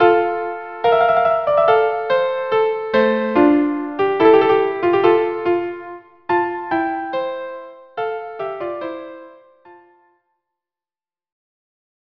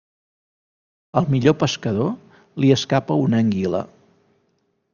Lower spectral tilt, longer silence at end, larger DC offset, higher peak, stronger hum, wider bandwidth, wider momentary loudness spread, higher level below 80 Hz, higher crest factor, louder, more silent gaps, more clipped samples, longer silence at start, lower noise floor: about the same, -7.5 dB/octave vs -6.5 dB/octave; first, 2.35 s vs 1.1 s; neither; about the same, 0 dBFS vs -2 dBFS; neither; second, 5.4 kHz vs 7.2 kHz; first, 15 LU vs 10 LU; about the same, -58 dBFS vs -56 dBFS; about the same, 18 dB vs 20 dB; about the same, -18 LUFS vs -20 LUFS; neither; neither; second, 0 s vs 1.15 s; first, under -90 dBFS vs -68 dBFS